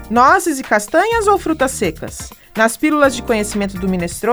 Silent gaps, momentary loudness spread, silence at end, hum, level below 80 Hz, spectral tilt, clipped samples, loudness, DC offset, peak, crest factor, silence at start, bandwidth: none; 10 LU; 0 s; none; -38 dBFS; -4.5 dB/octave; under 0.1%; -15 LUFS; under 0.1%; 0 dBFS; 16 dB; 0 s; over 20 kHz